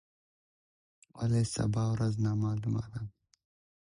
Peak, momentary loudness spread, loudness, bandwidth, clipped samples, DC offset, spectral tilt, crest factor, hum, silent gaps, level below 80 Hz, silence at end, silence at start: -18 dBFS; 11 LU; -32 LUFS; 11 kHz; under 0.1%; under 0.1%; -7 dB/octave; 16 dB; none; none; -56 dBFS; 0.75 s; 1.15 s